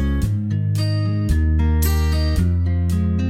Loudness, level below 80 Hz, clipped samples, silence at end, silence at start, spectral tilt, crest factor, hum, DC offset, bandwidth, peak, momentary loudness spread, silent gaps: -20 LUFS; -22 dBFS; under 0.1%; 0 s; 0 s; -7 dB/octave; 12 dB; none; under 0.1%; 16 kHz; -6 dBFS; 3 LU; none